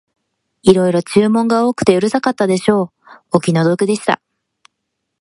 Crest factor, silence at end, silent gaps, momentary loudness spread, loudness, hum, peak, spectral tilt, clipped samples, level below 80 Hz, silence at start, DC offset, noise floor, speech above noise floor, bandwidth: 16 dB; 1.05 s; none; 5 LU; -15 LUFS; none; 0 dBFS; -6 dB/octave; under 0.1%; -54 dBFS; 0.65 s; under 0.1%; -74 dBFS; 61 dB; 11.5 kHz